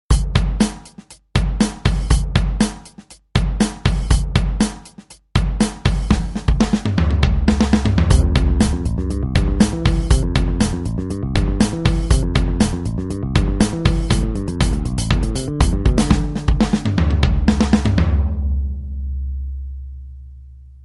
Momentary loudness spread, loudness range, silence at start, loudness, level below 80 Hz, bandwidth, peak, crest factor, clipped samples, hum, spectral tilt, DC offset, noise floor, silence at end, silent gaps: 8 LU; 3 LU; 0.1 s; -19 LUFS; -20 dBFS; 11.5 kHz; 0 dBFS; 16 dB; under 0.1%; none; -6 dB/octave; under 0.1%; -43 dBFS; 0.1 s; none